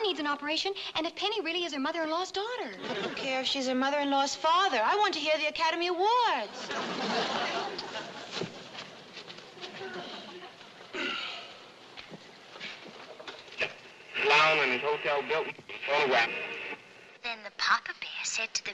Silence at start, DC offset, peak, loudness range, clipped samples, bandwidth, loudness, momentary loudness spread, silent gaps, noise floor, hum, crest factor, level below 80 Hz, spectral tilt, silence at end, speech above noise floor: 0 s; under 0.1%; -12 dBFS; 12 LU; under 0.1%; 12 kHz; -30 LUFS; 19 LU; none; -52 dBFS; none; 20 dB; -74 dBFS; -2 dB/octave; 0 s; 22 dB